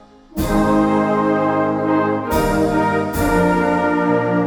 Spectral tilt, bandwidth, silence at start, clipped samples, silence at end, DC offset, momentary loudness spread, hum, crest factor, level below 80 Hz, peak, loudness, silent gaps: -6.5 dB/octave; 19 kHz; 0.35 s; under 0.1%; 0 s; under 0.1%; 3 LU; none; 12 dB; -34 dBFS; -4 dBFS; -17 LUFS; none